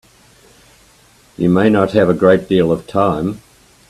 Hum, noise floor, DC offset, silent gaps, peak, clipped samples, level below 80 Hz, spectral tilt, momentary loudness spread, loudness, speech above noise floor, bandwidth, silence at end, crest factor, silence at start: none; -49 dBFS; under 0.1%; none; 0 dBFS; under 0.1%; -48 dBFS; -8 dB/octave; 9 LU; -14 LUFS; 36 dB; 13 kHz; 0.55 s; 16 dB; 1.4 s